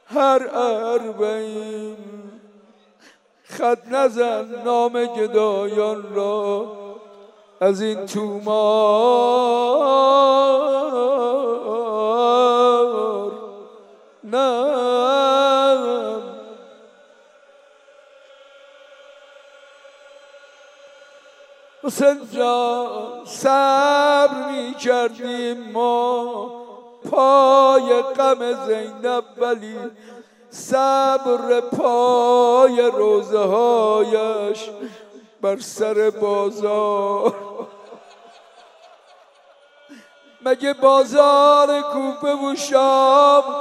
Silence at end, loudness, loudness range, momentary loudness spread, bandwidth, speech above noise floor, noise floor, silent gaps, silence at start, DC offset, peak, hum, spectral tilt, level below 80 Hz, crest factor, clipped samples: 0 s; -18 LUFS; 8 LU; 16 LU; 13.5 kHz; 36 dB; -53 dBFS; none; 0.1 s; under 0.1%; 0 dBFS; none; -4 dB/octave; -82 dBFS; 18 dB; under 0.1%